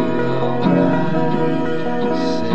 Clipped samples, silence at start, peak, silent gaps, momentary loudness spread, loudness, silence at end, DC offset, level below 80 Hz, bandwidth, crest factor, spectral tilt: under 0.1%; 0 s; -4 dBFS; none; 5 LU; -18 LUFS; 0 s; 7%; -46 dBFS; 8.2 kHz; 14 dB; -8 dB/octave